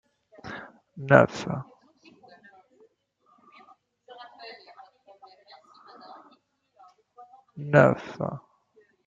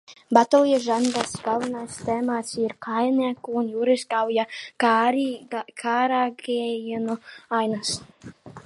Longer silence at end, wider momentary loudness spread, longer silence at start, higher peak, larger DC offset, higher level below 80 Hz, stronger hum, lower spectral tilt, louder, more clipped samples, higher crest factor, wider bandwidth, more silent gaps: first, 0.7 s vs 0.05 s; first, 29 LU vs 11 LU; first, 0.45 s vs 0.1 s; about the same, -2 dBFS vs -2 dBFS; neither; about the same, -68 dBFS vs -66 dBFS; neither; first, -7.5 dB/octave vs -4 dB/octave; about the same, -23 LUFS vs -24 LUFS; neither; first, 28 dB vs 22 dB; second, 7.6 kHz vs 11.5 kHz; neither